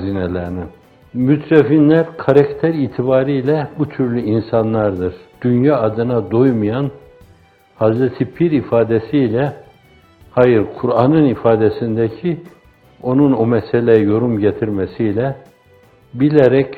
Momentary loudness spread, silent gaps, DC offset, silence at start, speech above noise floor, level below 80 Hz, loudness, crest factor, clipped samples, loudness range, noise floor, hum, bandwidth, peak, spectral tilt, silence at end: 10 LU; none; under 0.1%; 0 s; 34 dB; -50 dBFS; -15 LUFS; 16 dB; under 0.1%; 3 LU; -49 dBFS; none; 4.8 kHz; 0 dBFS; -10 dB/octave; 0 s